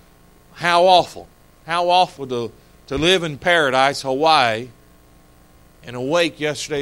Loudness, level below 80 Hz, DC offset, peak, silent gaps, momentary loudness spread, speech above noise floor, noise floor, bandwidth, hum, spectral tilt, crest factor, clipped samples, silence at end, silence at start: -18 LUFS; -48 dBFS; under 0.1%; 0 dBFS; none; 14 LU; 32 dB; -50 dBFS; 16.5 kHz; none; -3.5 dB/octave; 20 dB; under 0.1%; 0 s; 0.55 s